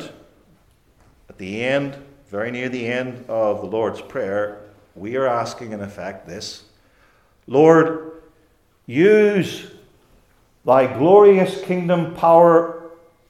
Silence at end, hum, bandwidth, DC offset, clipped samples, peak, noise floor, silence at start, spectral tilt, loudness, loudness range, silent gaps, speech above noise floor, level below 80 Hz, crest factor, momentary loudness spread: 0.35 s; none; 12.5 kHz; under 0.1%; under 0.1%; 0 dBFS; -59 dBFS; 0 s; -6.5 dB/octave; -17 LUFS; 11 LU; none; 42 dB; -60 dBFS; 20 dB; 20 LU